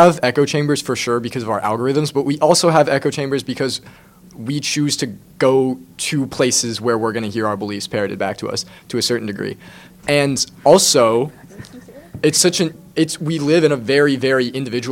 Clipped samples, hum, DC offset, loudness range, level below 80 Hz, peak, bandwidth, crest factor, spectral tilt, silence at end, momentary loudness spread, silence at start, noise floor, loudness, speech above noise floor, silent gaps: under 0.1%; none; under 0.1%; 4 LU; -54 dBFS; 0 dBFS; 17 kHz; 18 dB; -4 dB/octave; 0 s; 13 LU; 0 s; -39 dBFS; -17 LUFS; 22 dB; none